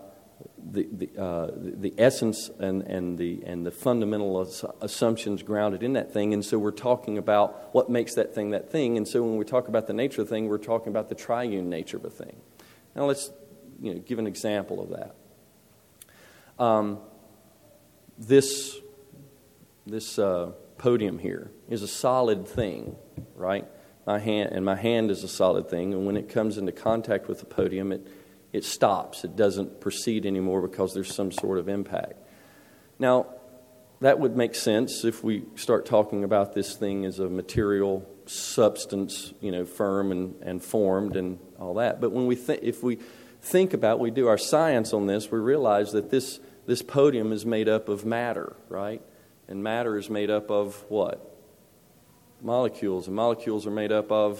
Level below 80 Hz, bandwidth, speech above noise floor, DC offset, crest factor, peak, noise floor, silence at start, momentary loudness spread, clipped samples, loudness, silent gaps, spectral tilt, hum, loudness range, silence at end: -60 dBFS; 17 kHz; 32 dB; under 0.1%; 22 dB; -6 dBFS; -59 dBFS; 0 s; 12 LU; under 0.1%; -27 LUFS; none; -5.5 dB/octave; none; 6 LU; 0 s